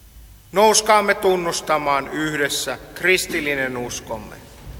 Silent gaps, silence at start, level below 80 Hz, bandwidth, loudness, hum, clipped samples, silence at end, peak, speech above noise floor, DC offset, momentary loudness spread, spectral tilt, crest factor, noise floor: none; 0.15 s; -46 dBFS; 19 kHz; -19 LUFS; none; under 0.1%; 0 s; -2 dBFS; 24 dB; under 0.1%; 13 LU; -2.5 dB/octave; 20 dB; -44 dBFS